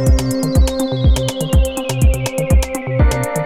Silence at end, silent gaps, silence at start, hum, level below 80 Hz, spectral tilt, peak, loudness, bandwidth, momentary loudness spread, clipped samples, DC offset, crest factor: 0 s; none; 0 s; none; -18 dBFS; -6 dB/octave; -2 dBFS; -16 LUFS; 15.5 kHz; 2 LU; under 0.1%; under 0.1%; 14 dB